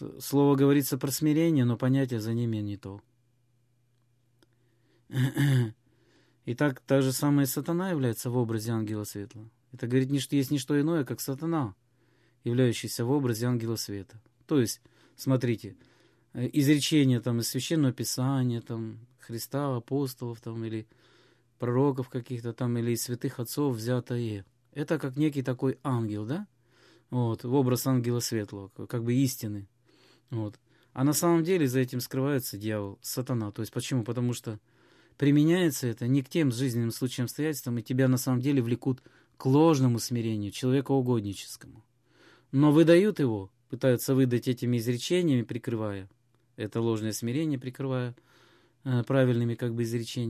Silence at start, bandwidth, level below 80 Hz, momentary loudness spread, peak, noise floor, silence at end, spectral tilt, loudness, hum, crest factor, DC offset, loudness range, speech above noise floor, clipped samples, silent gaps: 0 s; 15 kHz; -66 dBFS; 13 LU; -8 dBFS; -70 dBFS; 0 s; -6 dB/octave; -28 LUFS; none; 20 dB; under 0.1%; 6 LU; 42 dB; under 0.1%; none